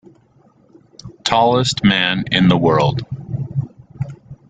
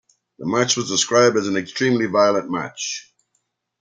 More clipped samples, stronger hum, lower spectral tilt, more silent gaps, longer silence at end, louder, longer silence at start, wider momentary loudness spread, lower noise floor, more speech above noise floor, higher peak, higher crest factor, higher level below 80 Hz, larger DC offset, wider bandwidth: neither; neither; first, -5.5 dB/octave vs -3.5 dB/octave; neither; second, 0.15 s vs 0.8 s; first, -16 LUFS vs -19 LUFS; first, 1.05 s vs 0.4 s; first, 16 LU vs 12 LU; second, -53 dBFS vs -72 dBFS; second, 38 dB vs 52 dB; about the same, 0 dBFS vs -2 dBFS; about the same, 18 dB vs 18 dB; first, -46 dBFS vs -66 dBFS; neither; about the same, 9.4 kHz vs 10 kHz